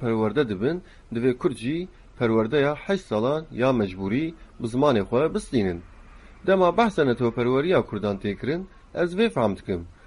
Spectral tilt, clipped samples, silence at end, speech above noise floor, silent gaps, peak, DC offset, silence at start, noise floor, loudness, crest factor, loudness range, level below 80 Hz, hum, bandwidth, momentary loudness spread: -7 dB/octave; under 0.1%; 0.15 s; 23 dB; none; -6 dBFS; under 0.1%; 0 s; -46 dBFS; -24 LUFS; 18 dB; 2 LU; -48 dBFS; none; 11.5 kHz; 11 LU